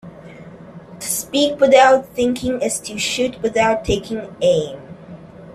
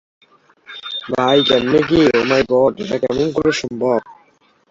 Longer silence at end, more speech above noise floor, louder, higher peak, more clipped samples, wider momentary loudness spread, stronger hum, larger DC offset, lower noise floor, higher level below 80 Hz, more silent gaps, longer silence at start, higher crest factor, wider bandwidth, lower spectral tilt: second, 0 s vs 0.6 s; second, 21 dB vs 40 dB; about the same, -17 LUFS vs -16 LUFS; about the same, 0 dBFS vs -2 dBFS; neither; first, 26 LU vs 11 LU; neither; neither; second, -38 dBFS vs -55 dBFS; about the same, -44 dBFS vs -48 dBFS; neither; second, 0.05 s vs 0.7 s; about the same, 18 dB vs 16 dB; first, 15 kHz vs 7.8 kHz; second, -3.5 dB/octave vs -5 dB/octave